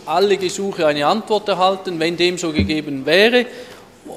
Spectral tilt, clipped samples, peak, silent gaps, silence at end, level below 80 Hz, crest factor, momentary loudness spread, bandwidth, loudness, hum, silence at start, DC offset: -4.5 dB/octave; under 0.1%; 0 dBFS; none; 0 s; -44 dBFS; 18 dB; 8 LU; 15 kHz; -17 LUFS; none; 0 s; under 0.1%